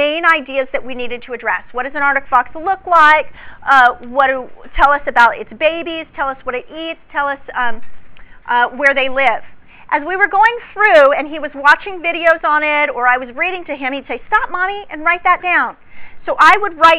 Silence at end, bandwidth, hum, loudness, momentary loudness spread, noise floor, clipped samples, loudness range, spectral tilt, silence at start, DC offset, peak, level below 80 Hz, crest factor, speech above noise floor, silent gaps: 0 s; 4 kHz; none; -14 LUFS; 14 LU; -34 dBFS; 0.5%; 5 LU; -6 dB/octave; 0 s; under 0.1%; 0 dBFS; -42 dBFS; 14 dB; 20 dB; none